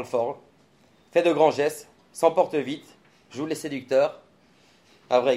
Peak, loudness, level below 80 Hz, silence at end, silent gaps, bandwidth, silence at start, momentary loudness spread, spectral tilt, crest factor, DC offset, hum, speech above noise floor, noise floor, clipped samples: -4 dBFS; -24 LUFS; -76 dBFS; 0 s; none; 15 kHz; 0 s; 18 LU; -5 dB/octave; 20 dB; under 0.1%; none; 36 dB; -59 dBFS; under 0.1%